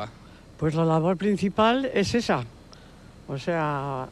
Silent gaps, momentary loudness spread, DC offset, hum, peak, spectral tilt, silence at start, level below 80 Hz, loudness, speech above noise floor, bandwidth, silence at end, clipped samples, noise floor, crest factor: none; 11 LU; under 0.1%; none; -12 dBFS; -6 dB/octave; 0 s; -52 dBFS; -25 LUFS; 24 dB; 12 kHz; 0 s; under 0.1%; -48 dBFS; 14 dB